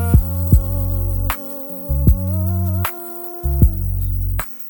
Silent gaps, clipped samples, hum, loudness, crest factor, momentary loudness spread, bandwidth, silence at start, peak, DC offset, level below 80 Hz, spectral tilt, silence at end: none; under 0.1%; none; -19 LUFS; 16 dB; 8 LU; 19 kHz; 0 s; 0 dBFS; under 0.1%; -20 dBFS; -7.5 dB/octave; 0 s